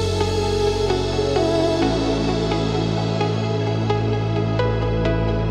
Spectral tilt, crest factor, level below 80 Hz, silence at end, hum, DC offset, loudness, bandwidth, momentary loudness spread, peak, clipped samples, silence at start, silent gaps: -6.5 dB/octave; 14 dB; -32 dBFS; 0 s; none; under 0.1%; -21 LUFS; 11.5 kHz; 2 LU; -6 dBFS; under 0.1%; 0 s; none